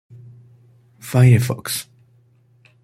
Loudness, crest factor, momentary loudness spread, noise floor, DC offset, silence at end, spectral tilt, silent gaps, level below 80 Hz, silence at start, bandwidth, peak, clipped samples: -17 LUFS; 18 dB; 13 LU; -55 dBFS; under 0.1%; 1 s; -6 dB/octave; none; -54 dBFS; 1.05 s; 15 kHz; -2 dBFS; under 0.1%